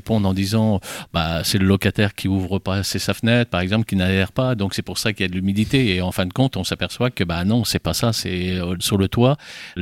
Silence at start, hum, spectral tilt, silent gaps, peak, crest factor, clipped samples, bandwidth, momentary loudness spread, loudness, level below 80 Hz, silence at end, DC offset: 0.05 s; none; -5.5 dB/octave; none; -4 dBFS; 16 dB; under 0.1%; 16.5 kHz; 5 LU; -20 LUFS; -42 dBFS; 0 s; under 0.1%